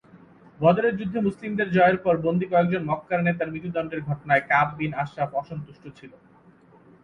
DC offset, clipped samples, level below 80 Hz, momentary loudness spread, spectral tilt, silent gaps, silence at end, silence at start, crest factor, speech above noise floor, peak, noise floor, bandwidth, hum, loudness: under 0.1%; under 0.1%; -58 dBFS; 11 LU; -8.5 dB/octave; none; 0.95 s; 0.6 s; 20 dB; 30 dB; -6 dBFS; -54 dBFS; 6 kHz; none; -24 LUFS